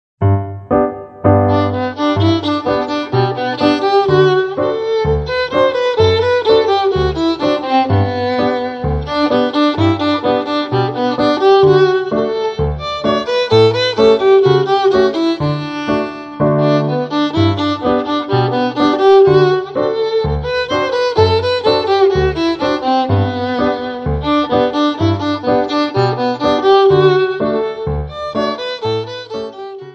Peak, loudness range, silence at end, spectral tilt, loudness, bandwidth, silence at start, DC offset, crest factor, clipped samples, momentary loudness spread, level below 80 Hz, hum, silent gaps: 0 dBFS; 3 LU; 0 s; -7 dB/octave; -14 LUFS; 7.4 kHz; 0.2 s; under 0.1%; 14 dB; under 0.1%; 9 LU; -36 dBFS; none; none